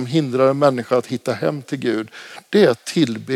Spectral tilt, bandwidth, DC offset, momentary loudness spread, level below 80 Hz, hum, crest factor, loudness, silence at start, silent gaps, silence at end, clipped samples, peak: -6 dB/octave; 15 kHz; under 0.1%; 9 LU; -72 dBFS; none; 16 dB; -19 LUFS; 0 s; none; 0 s; under 0.1%; -4 dBFS